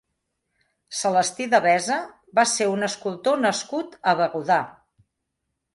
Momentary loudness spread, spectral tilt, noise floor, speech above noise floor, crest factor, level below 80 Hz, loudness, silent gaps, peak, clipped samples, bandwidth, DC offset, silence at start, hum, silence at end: 8 LU; -3 dB/octave; -79 dBFS; 57 dB; 18 dB; -70 dBFS; -22 LUFS; none; -6 dBFS; under 0.1%; 11.5 kHz; under 0.1%; 0.9 s; none; 1.05 s